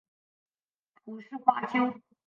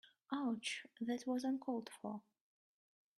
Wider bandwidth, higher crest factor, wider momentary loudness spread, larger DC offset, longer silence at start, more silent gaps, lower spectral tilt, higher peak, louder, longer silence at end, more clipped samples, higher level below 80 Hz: second, 7 kHz vs 12.5 kHz; first, 26 dB vs 18 dB; first, 19 LU vs 9 LU; neither; first, 1.05 s vs 0.05 s; neither; first, -6.5 dB/octave vs -4 dB/octave; first, -6 dBFS vs -26 dBFS; first, -28 LUFS vs -43 LUFS; second, 0.25 s vs 1 s; neither; first, -84 dBFS vs -90 dBFS